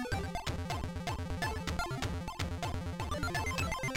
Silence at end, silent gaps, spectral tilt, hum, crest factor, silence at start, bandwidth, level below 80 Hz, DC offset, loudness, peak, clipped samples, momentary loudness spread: 0 s; none; -4.5 dB/octave; none; 14 dB; 0 s; 17 kHz; -44 dBFS; under 0.1%; -37 LUFS; -22 dBFS; under 0.1%; 4 LU